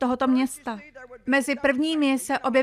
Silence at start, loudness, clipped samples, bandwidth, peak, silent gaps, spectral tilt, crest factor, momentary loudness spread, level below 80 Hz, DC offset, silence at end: 0 s; -23 LUFS; under 0.1%; 15.5 kHz; -8 dBFS; none; -3 dB/octave; 16 dB; 14 LU; -60 dBFS; under 0.1%; 0 s